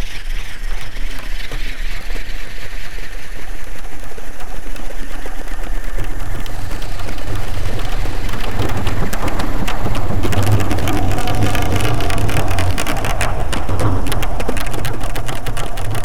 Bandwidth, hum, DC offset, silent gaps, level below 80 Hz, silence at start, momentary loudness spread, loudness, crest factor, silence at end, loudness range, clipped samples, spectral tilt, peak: 16.5 kHz; none; 30%; none; -22 dBFS; 0 s; 13 LU; -23 LUFS; 16 dB; 0 s; 12 LU; under 0.1%; -5 dB/octave; 0 dBFS